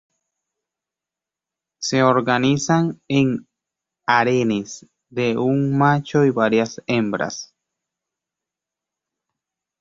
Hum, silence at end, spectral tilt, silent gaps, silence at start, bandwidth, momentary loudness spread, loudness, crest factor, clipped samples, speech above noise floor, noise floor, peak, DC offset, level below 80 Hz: none; 2.35 s; -5.5 dB/octave; none; 1.8 s; 7.8 kHz; 12 LU; -19 LUFS; 20 dB; under 0.1%; 69 dB; -88 dBFS; -2 dBFS; under 0.1%; -60 dBFS